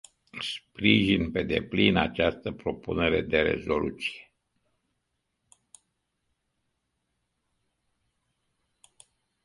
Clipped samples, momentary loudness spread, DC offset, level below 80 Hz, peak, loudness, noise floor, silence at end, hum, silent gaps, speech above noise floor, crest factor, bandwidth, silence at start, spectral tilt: under 0.1%; 12 LU; under 0.1%; -50 dBFS; -6 dBFS; -26 LUFS; -79 dBFS; 5.25 s; none; none; 53 dB; 24 dB; 11.5 kHz; 0.35 s; -6 dB/octave